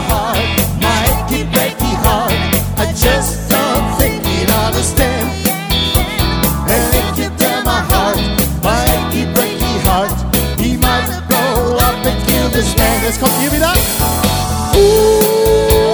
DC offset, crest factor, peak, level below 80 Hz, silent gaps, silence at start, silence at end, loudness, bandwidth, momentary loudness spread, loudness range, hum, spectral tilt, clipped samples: under 0.1%; 12 dB; 0 dBFS; -22 dBFS; none; 0 s; 0 s; -13 LUFS; over 20 kHz; 4 LU; 2 LU; none; -4 dB/octave; under 0.1%